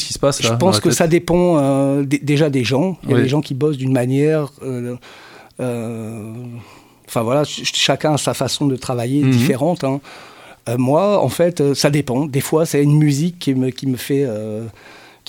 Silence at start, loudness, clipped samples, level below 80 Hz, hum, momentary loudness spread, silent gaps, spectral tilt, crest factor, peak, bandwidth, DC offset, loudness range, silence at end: 0 s; -17 LUFS; under 0.1%; -50 dBFS; none; 14 LU; none; -5.5 dB/octave; 16 dB; 0 dBFS; 17 kHz; under 0.1%; 6 LU; 0.3 s